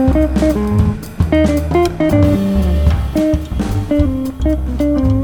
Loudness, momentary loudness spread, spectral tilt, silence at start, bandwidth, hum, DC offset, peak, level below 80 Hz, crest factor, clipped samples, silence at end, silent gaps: -15 LUFS; 5 LU; -8 dB/octave; 0 s; 17.5 kHz; none; under 0.1%; -2 dBFS; -20 dBFS; 12 dB; under 0.1%; 0 s; none